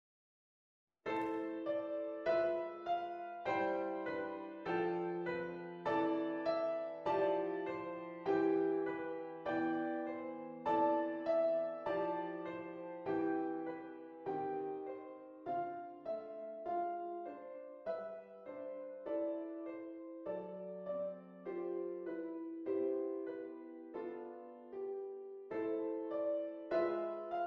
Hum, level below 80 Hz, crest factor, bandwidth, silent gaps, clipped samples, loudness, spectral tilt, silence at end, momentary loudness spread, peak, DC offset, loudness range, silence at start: none; -80 dBFS; 16 dB; 5.8 kHz; none; under 0.1%; -40 LUFS; -8 dB/octave; 0 s; 12 LU; -24 dBFS; under 0.1%; 7 LU; 1.05 s